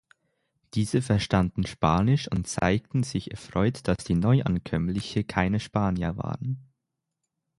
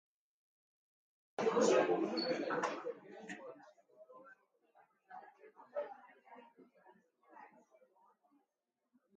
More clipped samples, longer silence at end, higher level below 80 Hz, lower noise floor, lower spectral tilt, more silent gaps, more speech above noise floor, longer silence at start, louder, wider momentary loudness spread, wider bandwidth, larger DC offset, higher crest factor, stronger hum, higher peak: neither; second, 0.95 s vs 1.7 s; first, -44 dBFS vs under -90 dBFS; second, -83 dBFS vs -89 dBFS; first, -6.5 dB/octave vs -4 dB/octave; neither; about the same, 57 dB vs 54 dB; second, 0.75 s vs 1.4 s; first, -26 LUFS vs -37 LUFS; second, 9 LU vs 28 LU; first, 11.5 kHz vs 9 kHz; neither; about the same, 20 dB vs 24 dB; neither; first, -6 dBFS vs -20 dBFS